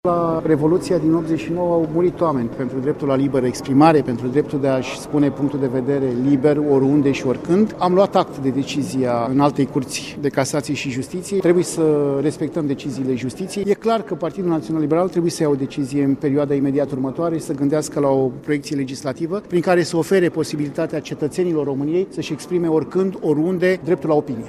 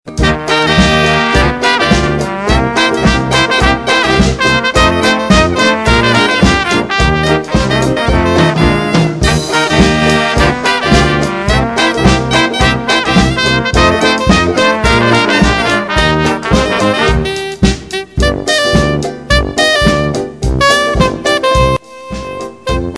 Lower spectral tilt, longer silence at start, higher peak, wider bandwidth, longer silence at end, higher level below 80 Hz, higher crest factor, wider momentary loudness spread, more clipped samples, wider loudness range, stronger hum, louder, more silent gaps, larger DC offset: first, -6.5 dB/octave vs -4.5 dB/octave; about the same, 0.05 s vs 0.05 s; about the same, -2 dBFS vs 0 dBFS; first, 13.5 kHz vs 11 kHz; about the same, 0 s vs 0 s; second, -52 dBFS vs -20 dBFS; first, 16 dB vs 10 dB; about the same, 7 LU vs 5 LU; second, under 0.1% vs 0.3%; about the same, 3 LU vs 2 LU; neither; second, -19 LUFS vs -10 LUFS; neither; second, under 0.1% vs 0.4%